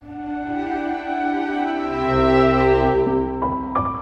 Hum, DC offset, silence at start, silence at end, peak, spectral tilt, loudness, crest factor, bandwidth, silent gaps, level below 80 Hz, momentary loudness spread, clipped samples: none; under 0.1%; 0 s; 0 s; -4 dBFS; -8 dB/octave; -20 LUFS; 16 dB; 7.6 kHz; none; -36 dBFS; 10 LU; under 0.1%